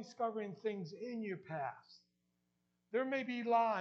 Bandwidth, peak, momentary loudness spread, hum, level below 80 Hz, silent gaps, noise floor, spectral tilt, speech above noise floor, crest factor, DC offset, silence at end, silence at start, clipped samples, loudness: 7.6 kHz; -20 dBFS; 11 LU; 60 Hz at -75 dBFS; under -90 dBFS; none; -83 dBFS; -4 dB/octave; 44 dB; 20 dB; under 0.1%; 0 s; 0 s; under 0.1%; -40 LUFS